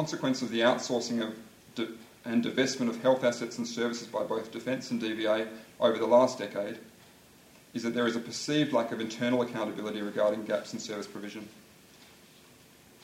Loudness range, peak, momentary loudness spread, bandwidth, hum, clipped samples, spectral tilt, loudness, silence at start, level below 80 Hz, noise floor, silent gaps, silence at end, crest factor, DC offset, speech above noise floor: 4 LU; -10 dBFS; 13 LU; 16 kHz; none; under 0.1%; -4.5 dB/octave; -30 LUFS; 0 s; -74 dBFS; -57 dBFS; none; 1 s; 20 dB; under 0.1%; 27 dB